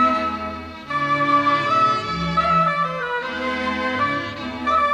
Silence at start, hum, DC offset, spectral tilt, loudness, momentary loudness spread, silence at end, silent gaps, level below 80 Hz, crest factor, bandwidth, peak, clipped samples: 0 s; none; under 0.1%; -5.5 dB/octave; -20 LUFS; 9 LU; 0 s; none; -48 dBFS; 14 dB; 10.5 kHz; -8 dBFS; under 0.1%